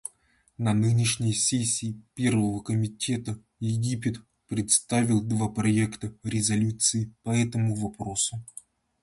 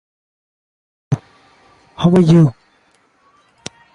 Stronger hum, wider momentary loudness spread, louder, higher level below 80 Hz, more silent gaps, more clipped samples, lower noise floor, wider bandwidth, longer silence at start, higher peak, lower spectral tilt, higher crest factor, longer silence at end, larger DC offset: neither; second, 11 LU vs 24 LU; second, -26 LUFS vs -14 LUFS; second, -56 dBFS vs -50 dBFS; neither; neither; first, -63 dBFS vs -57 dBFS; first, 11.5 kHz vs 10 kHz; second, 0.6 s vs 1.1 s; second, -8 dBFS vs -2 dBFS; second, -4.5 dB/octave vs -8 dB/octave; about the same, 20 dB vs 16 dB; second, 0.6 s vs 1.45 s; neither